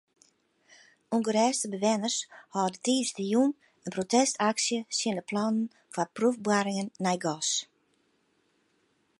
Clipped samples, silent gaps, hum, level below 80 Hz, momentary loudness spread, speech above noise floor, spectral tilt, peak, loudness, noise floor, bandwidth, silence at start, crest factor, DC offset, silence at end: under 0.1%; none; none; -78 dBFS; 8 LU; 43 dB; -3.5 dB/octave; -10 dBFS; -29 LUFS; -71 dBFS; 11.5 kHz; 1.1 s; 20 dB; under 0.1%; 1.55 s